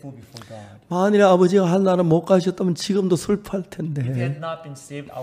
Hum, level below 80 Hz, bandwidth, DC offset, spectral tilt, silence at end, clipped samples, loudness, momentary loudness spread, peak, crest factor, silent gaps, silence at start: none; -56 dBFS; 15 kHz; under 0.1%; -7 dB/octave; 0 s; under 0.1%; -20 LUFS; 23 LU; -2 dBFS; 18 dB; none; 0.05 s